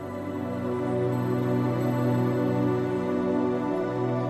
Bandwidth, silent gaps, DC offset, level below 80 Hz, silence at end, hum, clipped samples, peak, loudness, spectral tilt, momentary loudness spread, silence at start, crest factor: 13 kHz; none; under 0.1%; -58 dBFS; 0 s; none; under 0.1%; -14 dBFS; -27 LUFS; -9 dB/octave; 5 LU; 0 s; 12 dB